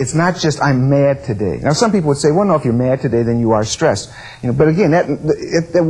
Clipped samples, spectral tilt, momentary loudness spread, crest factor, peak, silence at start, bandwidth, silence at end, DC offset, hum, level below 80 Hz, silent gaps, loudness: under 0.1%; -6 dB/octave; 6 LU; 14 dB; -2 dBFS; 0 s; 11 kHz; 0 s; under 0.1%; none; -42 dBFS; none; -15 LUFS